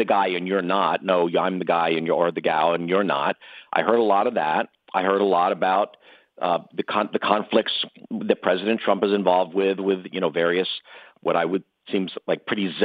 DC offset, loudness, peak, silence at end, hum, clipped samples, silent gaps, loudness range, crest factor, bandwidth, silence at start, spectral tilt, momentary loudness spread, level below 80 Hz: under 0.1%; -23 LUFS; -2 dBFS; 0 s; none; under 0.1%; none; 2 LU; 20 dB; 5 kHz; 0 s; -8 dB/octave; 7 LU; -76 dBFS